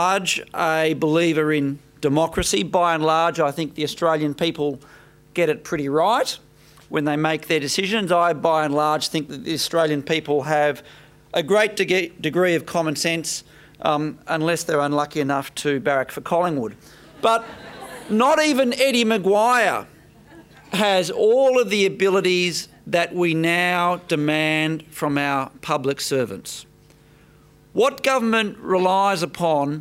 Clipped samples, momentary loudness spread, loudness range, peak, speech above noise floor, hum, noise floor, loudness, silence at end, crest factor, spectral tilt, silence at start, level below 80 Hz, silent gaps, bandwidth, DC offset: under 0.1%; 9 LU; 4 LU; -2 dBFS; 31 dB; none; -51 dBFS; -20 LUFS; 0 s; 18 dB; -4 dB/octave; 0 s; -54 dBFS; none; 16 kHz; under 0.1%